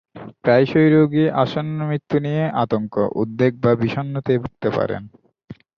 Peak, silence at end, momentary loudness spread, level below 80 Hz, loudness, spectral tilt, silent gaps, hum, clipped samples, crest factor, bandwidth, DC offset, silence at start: -2 dBFS; 0.25 s; 10 LU; -54 dBFS; -19 LUFS; -9 dB/octave; none; none; under 0.1%; 18 dB; 6.6 kHz; under 0.1%; 0.15 s